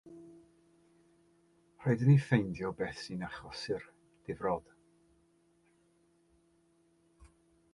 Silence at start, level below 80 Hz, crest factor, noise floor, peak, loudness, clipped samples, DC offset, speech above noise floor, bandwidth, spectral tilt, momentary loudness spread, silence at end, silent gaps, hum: 0.05 s; -66 dBFS; 24 dB; -70 dBFS; -14 dBFS; -33 LUFS; under 0.1%; under 0.1%; 38 dB; 11 kHz; -7.5 dB/octave; 18 LU; 3.15 s; none; none